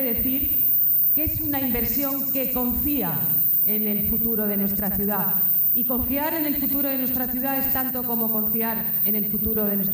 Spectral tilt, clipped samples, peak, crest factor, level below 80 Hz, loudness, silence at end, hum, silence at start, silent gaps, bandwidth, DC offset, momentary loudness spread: -6 dB/octave; under 0.1%; -12 dBFS; 10 dB; -44 dBFS; -20 LUFS; 0 s; none; 0 s; none; 17.5 kHz; under 0.1%; 5 LU